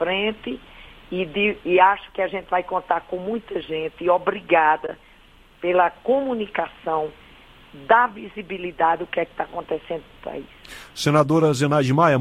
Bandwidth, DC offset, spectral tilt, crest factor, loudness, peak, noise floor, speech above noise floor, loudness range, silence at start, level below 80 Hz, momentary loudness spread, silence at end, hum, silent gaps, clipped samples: 15 kHz; under 0.1%; -6 dB/octave; 20 dB; -22 LUFS; -2 dBFS; -51 dBFS; 29 dB; 2 LU; 0 s; -52 dBFS; 17 LU; 0 s; none; none; under 0.1%